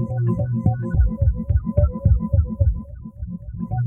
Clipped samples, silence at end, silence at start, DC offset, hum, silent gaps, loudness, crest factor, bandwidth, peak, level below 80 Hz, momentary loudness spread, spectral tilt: under 0.1%; 0 s; 0 s; under 0.1%; none; none; -21 LUFS; 14 dB; 1.8 kHz; -6 dBFS; -24 dBFS; 13 LU; -13.5 dB/octave